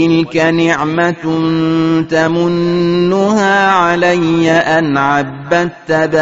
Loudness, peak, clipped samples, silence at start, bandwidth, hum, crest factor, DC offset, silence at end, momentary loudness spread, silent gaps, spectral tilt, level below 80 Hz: -12 LUFS; 0 dBFS; under 0.1%; 0 s; 8 kHz; none; 12 dB; 0.3%; 0 s; 4 LU; none; -4.5 dB/octave; -48 dBFS